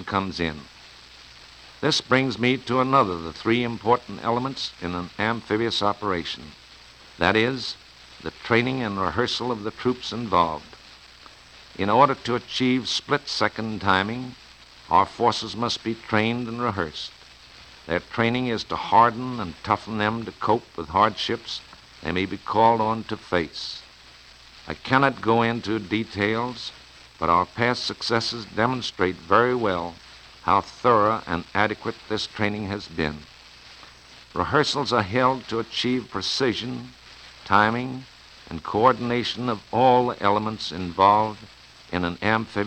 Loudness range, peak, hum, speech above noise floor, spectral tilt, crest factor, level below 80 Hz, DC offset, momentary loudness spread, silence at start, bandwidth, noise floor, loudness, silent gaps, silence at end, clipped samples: 3 LU; -2 dBFS; none; 25 dB; -5 dB/octave; 22 dB; -54 dBFS; under 0.1%; 15 LU; 0 s; 10 kHz; -49 dBFS; -23 LUFS; none; 0 s; under 0.1%